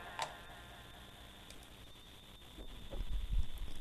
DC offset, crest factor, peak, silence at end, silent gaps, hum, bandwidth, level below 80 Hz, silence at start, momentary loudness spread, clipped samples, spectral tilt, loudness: under 0.1%; 18 dB; -22 dBFS; 0 s; none; 50 Hz at -65 dBFS; 14 kHz; -44 dBFS; 0 s; 13 LU; under 0.1%; -4 dB/octave; -49 LUFS